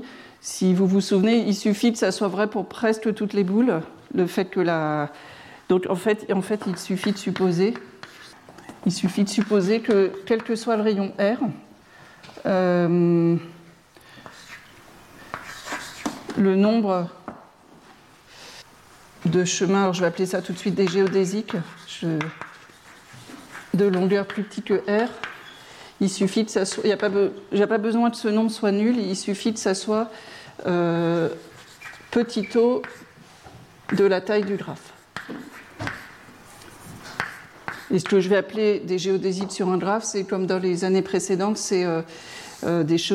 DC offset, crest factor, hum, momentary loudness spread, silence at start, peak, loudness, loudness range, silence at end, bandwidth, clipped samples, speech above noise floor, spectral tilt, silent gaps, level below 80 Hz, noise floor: under 0.1%; 18 dB; none; 21 LU; 0 s; -6 dBFS; -23 LUFS; 4 LU; 0 s; 14.5 kHz; under 0.1%; 29 dB; -5.5 dB/octave; none; -64 dBFS; -51 dBFS